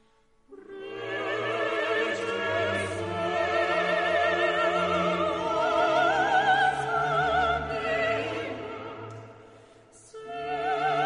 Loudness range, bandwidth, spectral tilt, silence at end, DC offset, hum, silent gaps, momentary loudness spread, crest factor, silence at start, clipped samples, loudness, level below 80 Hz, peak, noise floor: 6 LU; 10.5 kHz; -4.5 dB/octave; 0 s; under 0.1%; none; none; 15 LU; 16 dB; 0.5 s; under 0.1%; -26 LUFS; -54 dBFS; -12 dBFS; -62 dBFS